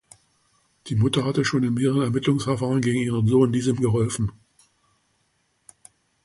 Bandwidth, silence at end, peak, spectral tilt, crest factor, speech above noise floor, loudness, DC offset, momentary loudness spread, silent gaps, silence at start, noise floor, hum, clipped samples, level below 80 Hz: 11.5 kHz; 1.95 s; -6 dBFS; -6.5 dB/octave; 18 dB; 48 dB; -22 LUFS; under 0.1%; 5 LU; none; 0.85 s; -69 dBFS; none; under 0.1%; -52 dBFS